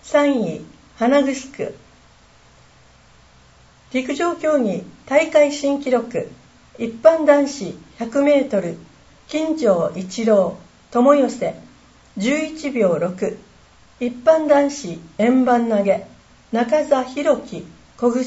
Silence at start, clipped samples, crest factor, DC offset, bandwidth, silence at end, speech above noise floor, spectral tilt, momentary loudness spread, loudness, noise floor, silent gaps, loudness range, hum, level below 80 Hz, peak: 0.05 s; under 0.1%; 20 dB; under 0.1%; 8 kHz; 0 s; 32 dB; -5.5 dB/octave; 15 LU; -19 LUFS; -50 dBFS; none; 7 LU; none; -56 dBFS; 0 dBFS